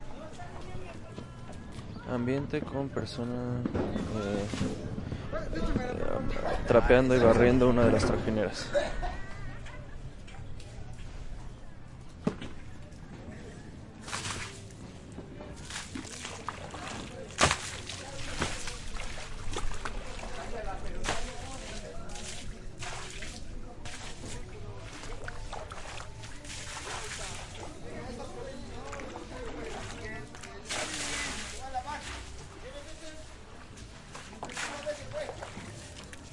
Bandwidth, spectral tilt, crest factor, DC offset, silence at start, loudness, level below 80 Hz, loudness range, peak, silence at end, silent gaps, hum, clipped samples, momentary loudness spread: 11.5 kHz; -5 dB/octave; 24 dB; under 0.1%; 0 s; -33 LUFS; -42 dBFS; 17 LU; -8 dBFS; 0 s; none; none; under 0.1%; 18 LU